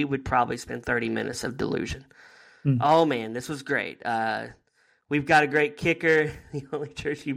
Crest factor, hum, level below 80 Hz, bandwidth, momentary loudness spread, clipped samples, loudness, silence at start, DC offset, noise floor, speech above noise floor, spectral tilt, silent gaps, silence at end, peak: 18 dB; none; -52 dBFS; 15.5 kHz; 13 LU; under 0.1%; -26 LUFS; 0 s; under 0.1%; -60 dBFS; 34 dB; -5.5 dB/octave; none; 0 s; -8 dBFS